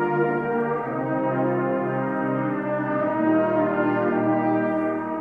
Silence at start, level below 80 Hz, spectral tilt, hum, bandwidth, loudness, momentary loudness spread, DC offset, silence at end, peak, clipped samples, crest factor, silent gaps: 0 s; -60 dBFS; -10 dB/octave; none; 3.9 kHz; -23 LUFS; 4 LU; under 0.1%; 0 s; -10 dBFS; under 0.1%; 12 dB; none